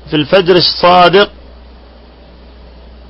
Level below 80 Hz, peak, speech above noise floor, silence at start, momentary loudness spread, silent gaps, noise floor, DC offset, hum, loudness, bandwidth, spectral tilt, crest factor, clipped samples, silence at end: -36 dBFS; 0 dBFS; 29 dB; 0.05 s; 5 LU; none; -37 dBFS; under 0.1%; none; -8 LUFS; 6 kHz; -7 dB/octave; 12 dB; 0.2%; 1.8 s